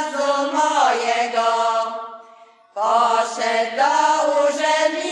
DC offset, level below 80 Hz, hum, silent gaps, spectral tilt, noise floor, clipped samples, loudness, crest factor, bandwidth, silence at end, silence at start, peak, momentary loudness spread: under 0.1%; under -90 dBFS; none; none; -1 dB/octave; -48 dBFS; under 0.1%; -19 LUFS; 14 dB; 11 kHz; 0 s; 0 s; -6 dBFS; 7 LU